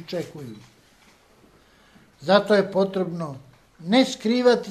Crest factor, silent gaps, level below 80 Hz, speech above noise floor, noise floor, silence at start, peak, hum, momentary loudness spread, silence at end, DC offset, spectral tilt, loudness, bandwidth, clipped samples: 20 dB; none; -66 dBFS; 34 dB; -56 dBFS; 0 s; -4 dBFS; none; 21 LU; 0 s; under 0.1%; -5.5 dB/octave; -22 LUFS; 13.5 kHz; under 0.1%